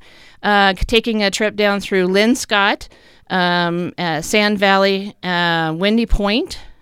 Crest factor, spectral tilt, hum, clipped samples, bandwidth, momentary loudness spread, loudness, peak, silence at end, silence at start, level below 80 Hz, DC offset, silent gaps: 16 dB; -4 dB/octave; none; under 0.1%; 16 kHz; 7 LU; -16 LUFS; 0 dBFS; 0.1 s; 0.45 s; -30 dBFS; under 0.1%; none